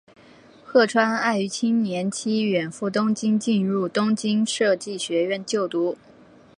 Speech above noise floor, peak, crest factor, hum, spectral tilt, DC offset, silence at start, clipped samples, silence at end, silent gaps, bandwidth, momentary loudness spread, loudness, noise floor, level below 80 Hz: 28 dB; -4 dBFS; 20 dB; none; -4.5 dB/octave; under 0.1%; 0.65 s; under 0.1%; 0.65 s; none; 11 kHz; 6 LU; -23 LUFS; -50 dBFS; -70 dBFS